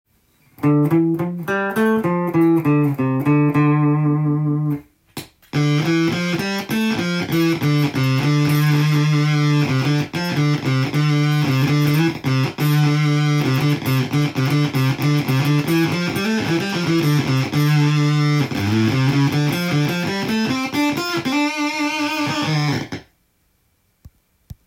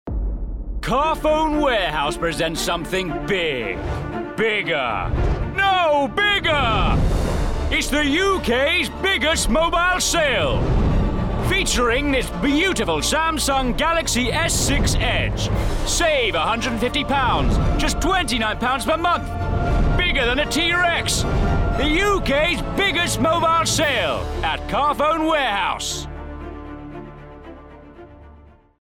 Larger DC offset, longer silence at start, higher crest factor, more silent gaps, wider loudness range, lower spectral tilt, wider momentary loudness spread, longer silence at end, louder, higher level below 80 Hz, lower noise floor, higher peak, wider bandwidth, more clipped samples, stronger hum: neither; first, 0.6 s vs 0.05 s; about the same, 12 dB vs 10 dB; neither; about the same, 3 LU vs 3 LU; first, -6.5 dB/octave vs -4 dB/octave; about the same, 5 LU vs 7 LU; second, 0.15 s vs 0.45 s; about the same, -18 LUFS vs -19 LUFS; second, -54 dBFS vs -28 dBFS; first, -63 dBFS vs -47 dBFS; first, -6 dBFS vs -10 dBFS; about the same, 16.5 kHz vs 16.5 kHz; neither; neither